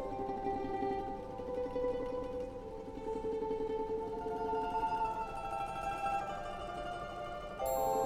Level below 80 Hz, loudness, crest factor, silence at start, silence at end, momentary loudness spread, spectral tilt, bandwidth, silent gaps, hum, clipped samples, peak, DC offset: -54 dBFS; -39 LUFS; 14 dB; 0 s; 0 s; 7 LU; -5.5 dB/octave; 16 kHz; none; none; under 0.1%; -22 dBFS; under 0.1%